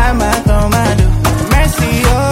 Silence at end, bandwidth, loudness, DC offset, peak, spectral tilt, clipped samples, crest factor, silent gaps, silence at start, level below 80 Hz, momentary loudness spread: 0 s; 16.5 kHz; -12 LUFS; under 0.1%; 0 dBFS; -5.5 dB/octave; under 0.1%; 10 dB; none; 0 s; -14 dBFS; 1 LU